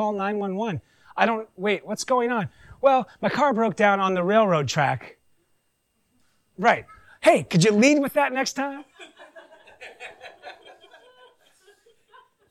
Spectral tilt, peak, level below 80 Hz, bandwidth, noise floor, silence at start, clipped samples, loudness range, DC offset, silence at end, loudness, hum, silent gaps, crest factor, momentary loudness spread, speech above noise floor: -5 dB/octave; -6 dBFS; -64 dBFS; 14 kHz; -71 dBFS; 0 s; under 0.1%; 4 LU; under 0.1%; 1.95 s; -22 LUFS; none; none; 18 dB; 21 LU; 49 dB